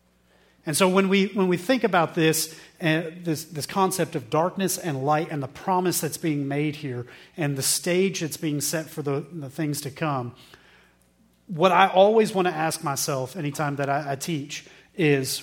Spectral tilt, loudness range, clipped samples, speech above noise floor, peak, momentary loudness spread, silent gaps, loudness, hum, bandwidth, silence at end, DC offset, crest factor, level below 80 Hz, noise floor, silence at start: -4.5 dB/octave; 4 LU; under 0.1%; 37 dB; -2 dBFS; 11 LU; none; -24 LUFS; none; 17.5 kHz; 0 s; under 0.1%; 24 dB; -66 dBFS; -61 dBFS; 0.65 s